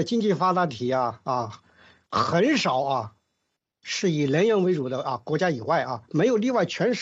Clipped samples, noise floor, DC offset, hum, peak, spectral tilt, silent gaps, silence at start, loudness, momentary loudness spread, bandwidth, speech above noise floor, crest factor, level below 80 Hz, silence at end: under 0.1%; -79 dBFS; under 0.1%; none; -10 dBFS; -5.5 dB/octave; none; 0 s; -24 LUFS; 8 LU; 8 kHz; 55 dB; 16 dB; -66 dBFS; 0 s